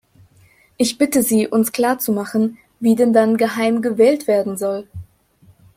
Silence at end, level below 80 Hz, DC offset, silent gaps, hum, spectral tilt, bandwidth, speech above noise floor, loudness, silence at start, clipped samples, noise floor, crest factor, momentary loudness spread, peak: 0.75 s; -58 dBFS; under 0.1%; none; none; -4.5 dB/octave; 16.5 kHz; 36 dB; -17 LUFS; 0.8 s; under 0.1%; -53 dBFS; 16 dB; 9 LU; -2 dBFS